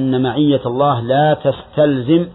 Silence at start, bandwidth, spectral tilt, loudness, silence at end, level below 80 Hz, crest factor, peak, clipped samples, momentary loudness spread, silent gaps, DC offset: 0 s; 4.1 kHz; -11 dB/octave; -15 LUFS; 0 s; -48 dBFS; 12 dB; -2 dBFS; under 0.1%; 3 LU; none; under 0.1%